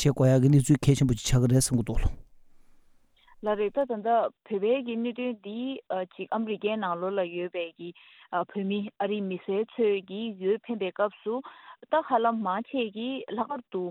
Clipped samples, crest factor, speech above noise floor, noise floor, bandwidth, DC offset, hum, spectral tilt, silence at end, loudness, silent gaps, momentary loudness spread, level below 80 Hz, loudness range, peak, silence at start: under 0.1%; 18 dB; 32 dB; -60 dBFS; 16 kHz; under 0.1%; none; -6 dB/octave; 0 s; -28 LUFS; none; 12 LU; -44 dBFS; 5 LU; -8 dBFS; 0 s